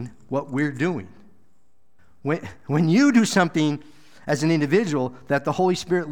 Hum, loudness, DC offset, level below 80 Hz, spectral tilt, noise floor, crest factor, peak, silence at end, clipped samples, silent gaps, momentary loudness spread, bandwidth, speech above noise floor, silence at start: none; -22 LUFS; 0.5%; -62 dBFS; -6 dB/octave; -69 dBFS; 18 dB; -6 dBFS; 0 s; under 0.1%; none; 12 LU; 17 kHz; 47 dB; 0 s